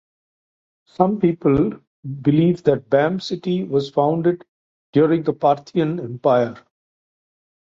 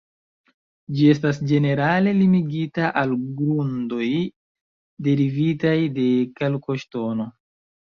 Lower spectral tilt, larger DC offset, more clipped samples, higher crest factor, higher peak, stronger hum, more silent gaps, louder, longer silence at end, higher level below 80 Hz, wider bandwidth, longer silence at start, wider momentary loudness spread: about the same, -8.5 dB/octave vs -8.5 dB/octave; neither; neither; about the same, 18 dB vs 18 dB; about the same, -2 dBFS vs -4 dBFS; neither; first, 1.87-2.03 s, 4.48-4.93 s vs 4.36-4.55 s, 4.61-4.97 s; about the same, -19 LUFS vs -21 LUFS; first, 1.15 s vs 0.55 s; first, -54 dBFS vs -60 dBFS; about the same, 7.4 kHz vs 7 kHz; about the same, 1 s vs 0.9 s; about the same, 7 LU vs 9 LU